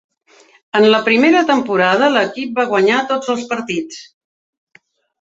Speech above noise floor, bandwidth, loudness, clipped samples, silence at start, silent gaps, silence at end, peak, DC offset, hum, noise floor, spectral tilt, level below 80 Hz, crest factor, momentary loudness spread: 36 dB; 8 kHz; -14 LUFS; under 0.1%; 0.75 s; none; 1.2 s; -2 dBFS; under 0.1%; none; -50 dBFS; -4.5 dB/octave; -64 dBFS; 14 dB; 10 LU